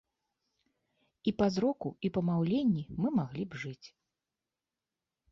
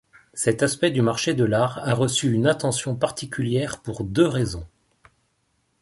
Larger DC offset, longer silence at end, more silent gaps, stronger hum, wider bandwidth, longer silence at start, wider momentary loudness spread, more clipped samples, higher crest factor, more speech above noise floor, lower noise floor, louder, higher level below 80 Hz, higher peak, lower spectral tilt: neither; first, 1.45 s vs 1.15 s; neither; neither; second, 7.4 kHz vs 11.5 kHz; first, 1.25 s vs 0.35 s; first, 11 LU vs 8 LU; neither; about the same, 18 dB vs 18 dB; first, over 58 dB vs 47 dB; first, under -90 dBFS vs -69 dBFS; second, -32 LUFS vs -23 LUFS; second, -64 dBFS vs -50 dBFS; second, -16 dBFS vs -4 dBFS; first, -7.5 dB/octave vs -5 dB/octave